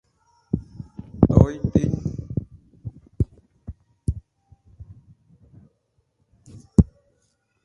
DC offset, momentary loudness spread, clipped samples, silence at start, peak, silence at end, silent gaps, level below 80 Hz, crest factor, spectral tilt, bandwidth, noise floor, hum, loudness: under 0.1%; 22 LU; under 0.1%; 0.55 s; 0 dBFS; 0.8 s; none; -34 dBFS; 26 dB; -10 dB/octave; 11 kHz; -69 dBFS; none; -23 LUFS